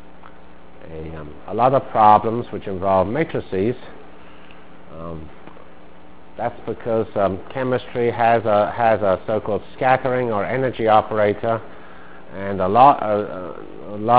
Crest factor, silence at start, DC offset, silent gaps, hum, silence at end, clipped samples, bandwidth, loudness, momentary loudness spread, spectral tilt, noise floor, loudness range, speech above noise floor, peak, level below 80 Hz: 20 dB; 0.25 s; 2%; none; none; 0 s; under 0.1%; 4 kHz; -19 LUFS; 20 LU; -10.5 dB/octave; -46 dBFS; 10 LU; 27 dB; 0 dBFS; -48 dBFS